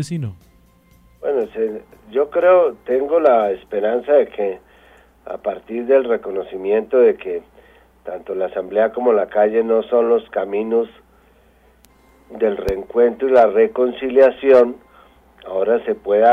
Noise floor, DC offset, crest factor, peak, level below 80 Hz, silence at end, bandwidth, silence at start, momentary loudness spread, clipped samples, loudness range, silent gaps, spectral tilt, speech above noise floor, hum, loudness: -53 dBFS; under 0.1%; 16 dB; -2 dBFS; -50 dBFS; 0 s; 10 kHz; 0 s; 14 LU; under 0.1%; 4 LU; none; -7 dB/octave; 36 dB; none; -17 LUFS